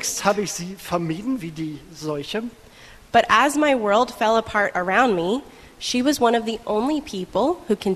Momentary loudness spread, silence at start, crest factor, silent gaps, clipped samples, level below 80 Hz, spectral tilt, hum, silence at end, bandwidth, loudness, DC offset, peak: 12 LU; 0 s; 20 dB; none; under 0.1%; -52 dBFS; -4 dB/octave; none; 0 s; 13.5 kHz; -21 LUFS; under 0.1%; -2 dBFS